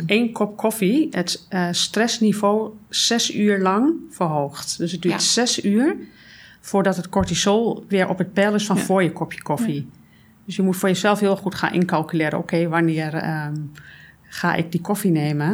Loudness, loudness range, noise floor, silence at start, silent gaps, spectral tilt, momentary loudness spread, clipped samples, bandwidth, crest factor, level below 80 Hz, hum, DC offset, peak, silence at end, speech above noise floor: -21 LUFS; 3 LU; -46 dBFS; 0 s; none; -4.5 dB/octave; 7 LU; under 0.1%; over 20 kHz; 18 dB; -54 dBFS; none; under 0.1%; -2 dBFS; 0 s; 26 dB